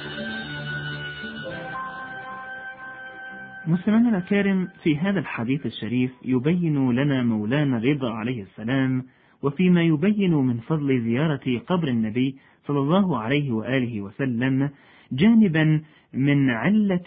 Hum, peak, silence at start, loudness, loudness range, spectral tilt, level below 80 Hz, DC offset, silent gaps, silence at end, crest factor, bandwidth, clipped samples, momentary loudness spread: none; -6 dBFS; 0 s; -23 LUFS; 4 LU; -12 dB/octave; -56 dBFS; under 0.1%; none; 0 s; 16 dB; 4.7 kHz; under 0.1%; 14 LU